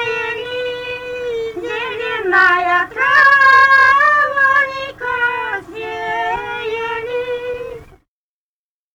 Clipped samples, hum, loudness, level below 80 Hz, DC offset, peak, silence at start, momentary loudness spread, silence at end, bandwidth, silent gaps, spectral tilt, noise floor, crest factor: under 0.1%; none; -14 LUFS; -50 dBFS; under 0.1%; -2 dBFS; 0 s; 16 LU; 1.1 s; 17 kHz; none; -3 dB/octave; under -90 dBFS; 14 dB